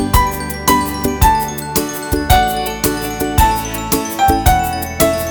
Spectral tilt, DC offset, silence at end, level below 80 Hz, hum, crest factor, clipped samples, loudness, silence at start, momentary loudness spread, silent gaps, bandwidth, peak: -4 dB/octave; under 0.1%; 0 s; -22 dBFS; none; 14 dB; under 0.1%; -15 LUFS; 0 s; 6 LU; none; over 20 kHz; 0 dBFS